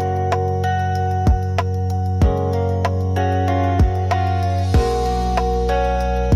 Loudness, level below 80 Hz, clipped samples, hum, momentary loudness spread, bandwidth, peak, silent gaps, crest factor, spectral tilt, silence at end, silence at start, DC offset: -19 LUFS; -24 dBFS; under 0.1%; none; 2 LU; 11.5 kHz; -6 dBFS; none; 12 dB; -7.5 dB/octave; 0 s; 0 s; under 0.1%